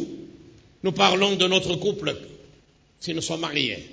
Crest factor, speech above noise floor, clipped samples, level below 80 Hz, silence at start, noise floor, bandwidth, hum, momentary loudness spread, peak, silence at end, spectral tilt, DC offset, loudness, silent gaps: 22 dB; 33 dB; under 0.1%; -56 dBFS; 0 s; -57 dBFS; 8 kHz; none; 17 LU; -4 dBFS; 0 s; -3.5 dB/octave; under 0.1%; -23 LUFS; none